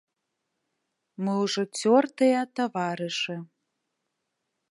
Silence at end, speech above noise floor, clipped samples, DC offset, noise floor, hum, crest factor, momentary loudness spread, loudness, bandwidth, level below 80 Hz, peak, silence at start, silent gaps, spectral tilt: 1.25 s; 56 dB; under 0.1%; under 0.1%; -81 dBFS; none; 20 dB; 9 LU; -26 LUFS; 11.5 kHz; -84 dBFS; -8 dBFS; 1.2 s; none; -4.5 dB/octave